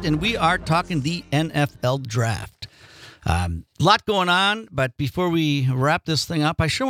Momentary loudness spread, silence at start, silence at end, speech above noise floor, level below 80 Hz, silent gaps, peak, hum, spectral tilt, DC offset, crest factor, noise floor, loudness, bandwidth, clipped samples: 8 LU; 0 s; 0 s; 25 dB; -44 dBFS; none; -2 dBFS; none; -5 dB/octave; under 0.1%; 20 dB; -46 dBFS; -21 LUFS; 16 kHz; under 0.1%